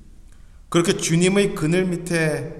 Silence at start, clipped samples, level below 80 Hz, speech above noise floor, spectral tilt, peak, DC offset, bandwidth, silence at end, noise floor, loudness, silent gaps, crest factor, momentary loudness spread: 0 s; under 0.1%; -44 dBFS; 24 dB; -5 dB/octave; -4 dBFS; under 0.1%; 14 kHz; 0 s; -44 dBFS; -20 LUFS; none; 18 dB; 4 LU